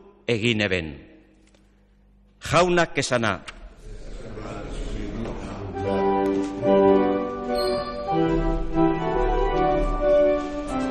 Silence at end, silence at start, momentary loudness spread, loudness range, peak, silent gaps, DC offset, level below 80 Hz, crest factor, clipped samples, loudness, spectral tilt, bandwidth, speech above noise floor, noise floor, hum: 0 s; 0.3 s; 16 LU; 6 LU; -6 dBFS; none; under 0.1%; -34 dBFS; 18 dB; under 0.1%; -23 LUFS; -5.5 dB/octave; 13.5 kHz; 34 dB; -57 dBFS; 50 Hz at -50 dBFS